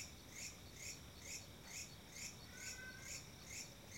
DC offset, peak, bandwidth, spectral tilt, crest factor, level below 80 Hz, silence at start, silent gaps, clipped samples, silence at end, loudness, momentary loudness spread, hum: under 0.1%; -36 dBFS; 16.5 kHz; -1.5 dB/octave; 16 dB; -68 dBFS; 0 s; none; under 0.1%; 0 s; -51 LUFS; 2 LU; none